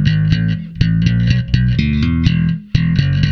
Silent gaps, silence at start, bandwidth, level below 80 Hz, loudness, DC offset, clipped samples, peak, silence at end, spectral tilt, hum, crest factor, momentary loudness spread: none; 0 s; 6.4 kHz; -24 dBFS; -15 LUFS; under 0.1%; under 0.1%; 0 dBFS; 0 s; -7.5 dB/octave; none; 14 dB; 3 LU